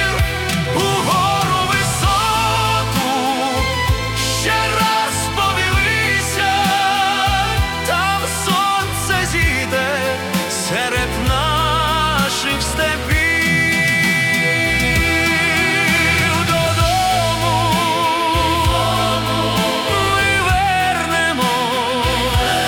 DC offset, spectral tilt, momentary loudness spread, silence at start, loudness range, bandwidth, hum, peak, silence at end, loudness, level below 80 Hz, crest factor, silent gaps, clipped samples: under 0.1%; -3.5 dB/octave; 4 LU; 0 s; 3 LU; 18 kHz; none; -4 dBFS; 0 s; -16 LUFS; -30 dBFS; 12 dB; none; under 0.1%